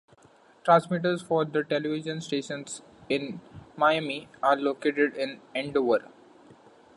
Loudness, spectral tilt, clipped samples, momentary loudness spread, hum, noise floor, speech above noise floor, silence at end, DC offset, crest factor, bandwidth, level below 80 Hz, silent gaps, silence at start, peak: -27 LUFS; -5.5 dB/octave; under 0.1%; 13 LU; none; -58 dBFS; 31 dB; 0.9 s; under 0.1%; 22 dB; 11.5 kHz; -68 dBFS; none; 0.65 s; -6 dBFS